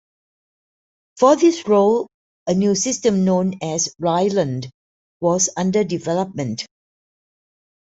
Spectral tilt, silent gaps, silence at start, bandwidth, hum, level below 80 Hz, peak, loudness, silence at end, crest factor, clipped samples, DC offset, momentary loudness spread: -5 dB/octave; 2.14-2.46 s, 4.74-5.20 s; 1.15 s; 8.2 kHz; none; -60 dBFS; -2 dBFS; -19 LUFS; 1.15 s; 18 dB; under 0.1%; under 0.1%; 13 LU